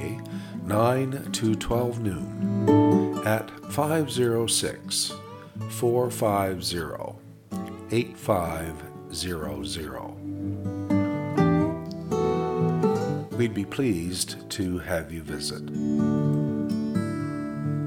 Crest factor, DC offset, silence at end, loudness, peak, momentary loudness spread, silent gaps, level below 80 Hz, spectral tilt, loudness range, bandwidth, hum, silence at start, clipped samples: 18 dB; under 0.1%; 0 s; -27 LUFS; -8 dBFS; 12 LU; none; -52 dBFS; -5.5 dB/octave; 6 LU; 18 kHz; none; 0 s; under 0.1%